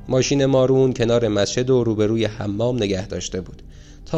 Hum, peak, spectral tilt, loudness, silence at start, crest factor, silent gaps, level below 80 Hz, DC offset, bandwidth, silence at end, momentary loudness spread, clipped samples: none; -6 dBFS; -5.5 dB/octave; -19 LUFS; 0 s; 14 dB; none; -42 dBFS; under 0.1%; 8.4 kHz; 0 s; 10 LU; under 0.1%